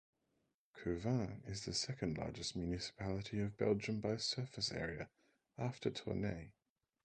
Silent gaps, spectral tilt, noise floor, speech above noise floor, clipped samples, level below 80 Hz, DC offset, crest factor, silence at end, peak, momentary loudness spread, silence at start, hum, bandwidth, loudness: none; -5 dB/octave; -84 dBFS; 43 dB; under 0.1%; -62 dBFS; under 0.1%; 20 dB; 0.55 s; -22 dBFS; 8 LU; 0.75 s; none; 9.6 kHz; -42 LUFS